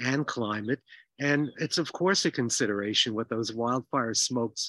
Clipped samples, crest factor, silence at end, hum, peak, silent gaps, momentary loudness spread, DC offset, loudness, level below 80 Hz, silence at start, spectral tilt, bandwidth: under 0.1%; 18 dB; 0 s; none; -10 dBFS; none; 6 LU; under 0.1%; -28 LUFS; -76 dBFS; 0 s; -3.5 dB/octave; 12.5 kHz